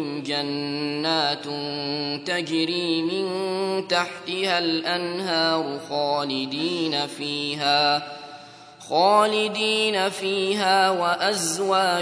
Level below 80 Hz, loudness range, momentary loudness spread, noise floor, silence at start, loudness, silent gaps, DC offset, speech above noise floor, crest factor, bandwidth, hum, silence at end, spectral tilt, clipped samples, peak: -74 dBFS; 4 LU; 8 LU; -44 dBFS; 0 s; -23 LUFS; none; under 0.1%; 21 dB; 18 dB; 11 kHz; none; 0 s; -3 dB/octave; under 0.1%; -6 dBFS